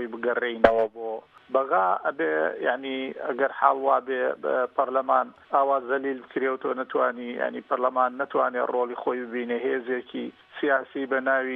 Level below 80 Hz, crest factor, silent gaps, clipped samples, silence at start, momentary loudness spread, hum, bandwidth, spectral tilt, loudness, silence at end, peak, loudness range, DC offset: -62 dBFS; 24 dB; none; under 0.1%; 0 s; 8 LU; none; 5 kHz; -6.5 dB/octave; -26 LUFS; 0 s; -2 dBFS; 2 LU; under 0.1%